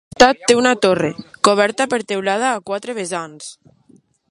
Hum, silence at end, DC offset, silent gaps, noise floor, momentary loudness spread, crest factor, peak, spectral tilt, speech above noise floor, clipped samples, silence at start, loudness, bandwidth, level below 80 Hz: none; 0.8 s; under 0.1%; none; -53 dBFS; 13 LU; 18 dB; 0 dBFS; -3 dB/octave; 36 dB; under 0.1%; 0.2 s; -17 LUFS; 11.5 kHz; -50 dBFS